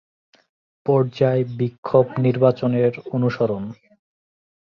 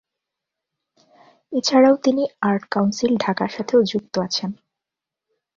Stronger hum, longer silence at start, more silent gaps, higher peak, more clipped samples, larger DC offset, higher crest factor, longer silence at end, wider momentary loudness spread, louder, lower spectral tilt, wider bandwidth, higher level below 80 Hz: neither; second, 0.85 s vs 1.5 s; first, 1.78-1.83 s vs none; about the same, -2 dBFS vs -4 dBFS; neither; neither; about the same, 20 dB vs 18 dB; about the same, 1 s vs 1.05 s; about the same, 8 LU vs 9 LU; about the same, -20 LUFS vs -20 LUFS; first, -9.5 dB/octave vs -5 dB/octave; second, 6.4 kHz vs 7.6 kHz; about the same, -60 dBFS vs -62 dBFS